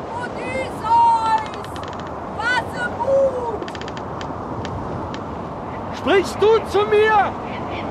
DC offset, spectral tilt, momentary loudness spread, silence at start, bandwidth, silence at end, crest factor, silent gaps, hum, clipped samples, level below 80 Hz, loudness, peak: under 0.1%; -5.5 dB/octave; 14 LU; 0 s; 13 kHz; 0 s; 14 dB; none; none; under 0.1%; -44 dBFS; -21 LUFS; -6 dBFS